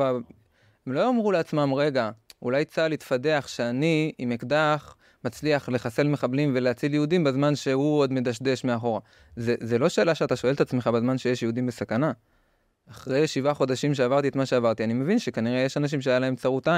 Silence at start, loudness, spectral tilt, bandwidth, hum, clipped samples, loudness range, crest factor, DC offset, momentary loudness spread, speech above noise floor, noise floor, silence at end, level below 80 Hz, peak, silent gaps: 0 s; -25 LUFS; -6.5 dB/octave; 15 kHz; none; under 0.1%; 2 LU; 16 dB; under 0.1%; 7 LU; 43 dB; -68 dBFS; 0 s; -64 dBFS; -8 dBFS; none